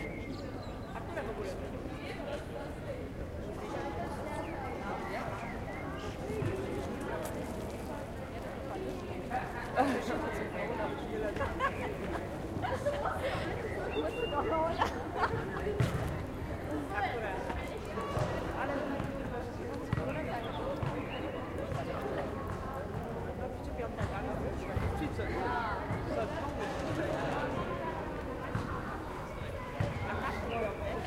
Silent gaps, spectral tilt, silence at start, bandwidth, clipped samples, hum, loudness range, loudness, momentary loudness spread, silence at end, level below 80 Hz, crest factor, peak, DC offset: none; -6.5 dB/octave; 0 s; 16.5 kHz; under 0.1%; none; 5 LU; -37 LUFS; 7 LU; 0 s; -48 dBFS; 20 dB; -16 dBFS; under 0.1%